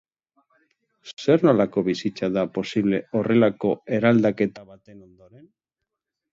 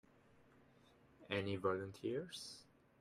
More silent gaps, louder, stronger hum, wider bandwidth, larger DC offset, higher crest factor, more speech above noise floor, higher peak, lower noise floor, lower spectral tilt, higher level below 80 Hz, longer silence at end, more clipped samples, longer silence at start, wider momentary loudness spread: neither; first, -22 LUFS vs -44 LUFS; neither; second, 7.6 kHz vs 15 kHz; neither; about the same, 20 dB vs 22 dB; first, 62 dB vs 26 dB; first, -4 dBFS vs -24 dBFS; first, -84 dBFS vs -69 dBFS; first, -7.5 dB/octave vs -5.5 dB/octave; first, -62 dBFS vs -80 dBFS; first, 1.35 s vs 0.4 s; neither; second, 1.05 s vs 1.2 s; second, 8 LU vs 12 LU